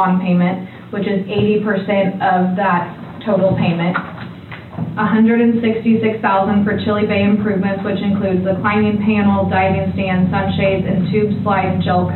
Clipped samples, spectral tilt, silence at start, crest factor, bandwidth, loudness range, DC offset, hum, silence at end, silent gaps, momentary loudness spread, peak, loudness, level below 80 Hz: under 0.1%; -10 dB/octave; 0 s; 10 dB; 4.3 kHz; 2 LU; under 0.1%; none; 0 s; none; 9 LU; -4 dBFS; -16 LUFS; -46 dBFS